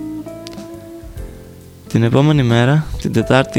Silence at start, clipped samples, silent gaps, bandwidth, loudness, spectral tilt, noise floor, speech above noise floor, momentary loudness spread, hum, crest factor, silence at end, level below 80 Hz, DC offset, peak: 0 s; under 0.1%; none; 15.5 kHz; -14 LUFS; -7 dB/octave; -38 dBFS; 24 dB; 21 LU; none; 16 dB; 0 s; -36 dBFS; under 0.1%; 0 dBFS